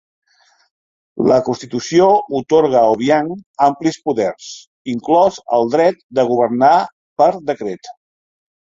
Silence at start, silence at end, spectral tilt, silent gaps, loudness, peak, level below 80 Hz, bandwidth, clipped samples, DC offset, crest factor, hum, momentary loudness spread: 1.15 s; 0.75 s; -5.5 dB/octave; 3.46-3.54 s, 4.67-4.85 s, 6.03-6.09 s, 6.92-7.16 s; -15 LUFS; 0 dBFS; -58 dBFS; 7.8 kHz; under 0.1%; under 0.1%; 16 dB; none; 13 LU